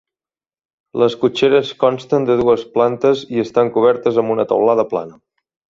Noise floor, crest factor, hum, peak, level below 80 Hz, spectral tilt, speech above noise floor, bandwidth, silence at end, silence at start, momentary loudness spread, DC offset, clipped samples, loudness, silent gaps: under -90 dBFS; 14 dB; none; -2 dBFS; -56 dBFS; -6.5 dB/octave; over 75 dB; 7.4 kHz; 0.65 s; 0.95 s; 5 LU; under 0.1%; under 0.1%; -16 LUFS; none